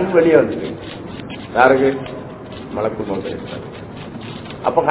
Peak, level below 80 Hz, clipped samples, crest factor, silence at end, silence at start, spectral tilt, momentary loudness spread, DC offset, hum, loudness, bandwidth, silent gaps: 0 dBFS; -46 dBFS; under 0.1%; 18 dB; 0 s; 0 s; -10.5 dB/octave; 19 LU; under 0.1%; none; -17 LUFS; 4 kHz; none